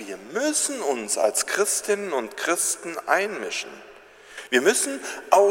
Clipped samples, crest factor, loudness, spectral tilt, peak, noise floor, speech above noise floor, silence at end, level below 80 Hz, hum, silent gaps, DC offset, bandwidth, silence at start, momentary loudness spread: under 0.1%; 24 dB; -23 LUFS; -1 dB/octave; 0 dBFS; -44 dBFS; 20 dB; 0 s; -70 dBFS; 50 Hz at -70 dBFS; none; under 0.1%; 16.5 kHz; 0 s; 11 LU